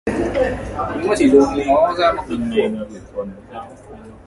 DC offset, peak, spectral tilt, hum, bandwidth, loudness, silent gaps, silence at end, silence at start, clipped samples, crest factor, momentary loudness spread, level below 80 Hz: under 0.1%; 0 dBFS; -6 dB/octave; none; 11.5 kHz; -17 LUFS; none; 0.1 s; 0.05 s; under 0.1%; 18 dB; 19 LU; -38 dBFS